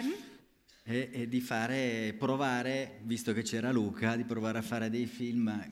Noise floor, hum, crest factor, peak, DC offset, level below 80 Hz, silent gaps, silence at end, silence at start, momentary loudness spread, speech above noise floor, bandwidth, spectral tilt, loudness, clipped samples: -63 dBFS; none; 18 dB; -16 dBFS; under 0.1%; -72 dBFS; none; 0 s; 0 s; 6 LU; 30 dB; 16 kHz; -5.5 dB/octave; -34 LUFS; under 0.1%